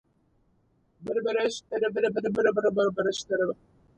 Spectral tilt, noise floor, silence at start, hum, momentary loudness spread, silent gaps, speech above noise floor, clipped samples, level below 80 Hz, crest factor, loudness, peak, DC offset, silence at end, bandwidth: -4.5 dB/octave; -67 dBFS; 1 s; none; 7 LU; none; 41 dB; under 0.1%; -66 dBFS; 18 dB; -27 LUFS; -10 dBFS; under 0.1%; 0.45 s; 9 kHz